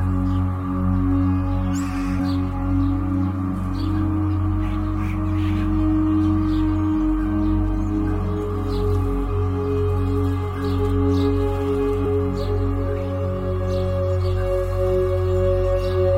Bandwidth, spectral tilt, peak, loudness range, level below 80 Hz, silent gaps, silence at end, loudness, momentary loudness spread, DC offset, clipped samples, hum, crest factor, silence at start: 8.4 kHz; -9 dB/octave; -8 dBFS; 2 LU; -28 dBFS; none; 0 s; -22 LUFS; 4 LU; under 0.1%; under 0.1%; none; 12 dB; 0 s